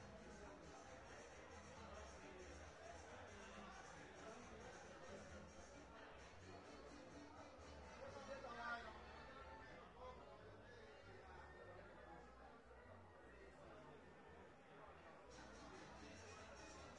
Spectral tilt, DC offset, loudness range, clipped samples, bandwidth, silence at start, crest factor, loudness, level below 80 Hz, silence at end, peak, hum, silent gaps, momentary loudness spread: -4.5 dB/octave; under 0.1%; 6 LU; under 0.1%; 10.5 kHz; 0 s; 20 dB; -59 LUFS; -72 dBFS; 0 s; -40 dBFS; none; none; 6 LU